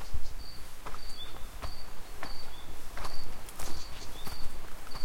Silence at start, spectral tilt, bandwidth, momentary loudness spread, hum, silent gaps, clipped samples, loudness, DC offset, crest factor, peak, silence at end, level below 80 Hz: 0 s; -3.5 dB/octave; 16 kHz; 5 LU; none; none; under 0.1%; -44 LUFS; under 0.1%; 12 dB; -16 dBFS; 0 s; -40 dBFS